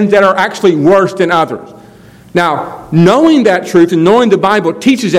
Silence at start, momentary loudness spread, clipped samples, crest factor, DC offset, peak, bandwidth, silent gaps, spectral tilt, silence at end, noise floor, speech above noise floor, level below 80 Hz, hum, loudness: 0 s; 7 LU; 2%; 10 dB; under 0.1%; 0 dBFS; 14 kHz; none; -6 dB/octave; 0 s; -37 dBFS; 28 dB; -48 dBFS; none; -9 LUFS